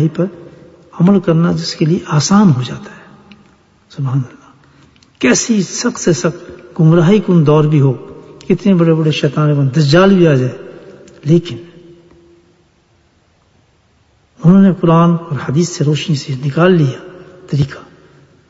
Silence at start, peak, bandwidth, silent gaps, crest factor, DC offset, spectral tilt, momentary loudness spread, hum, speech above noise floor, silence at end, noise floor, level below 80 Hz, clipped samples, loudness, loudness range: 0 s; 0 dBFS; 8 kHz; none; 14 dB; under 0.1%; -6.5 dB/octave; 17 LU; none; 42 dB; 0.7 s; -53 dBFS; -48 dBFS; under 0.1%; -12 LUFS; 7 LU